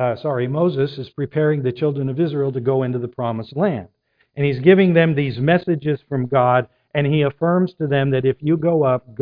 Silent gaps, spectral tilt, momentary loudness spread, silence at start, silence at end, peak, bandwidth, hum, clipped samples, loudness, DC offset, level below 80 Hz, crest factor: none; -11 dB/octave; 9 LU; 0 s; 0.05 s; -2 dBFS; 5.2 kHz; none; under 0.1%; -19 LUFS; under 0.1%; -56 dBFS; 18 dB